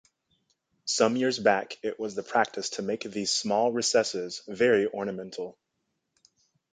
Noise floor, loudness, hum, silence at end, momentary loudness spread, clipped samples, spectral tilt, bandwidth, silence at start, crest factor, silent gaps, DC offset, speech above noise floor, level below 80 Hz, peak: -80 dBFS; -27 LUFS; none; 1.2 s; 12 LU; under 0.1%; -3 dB/octave; 9.6 kHz; 0.85 s; 22 dB; none; under 0.1%; 53 dB; -72 dBFS; -8 dBFS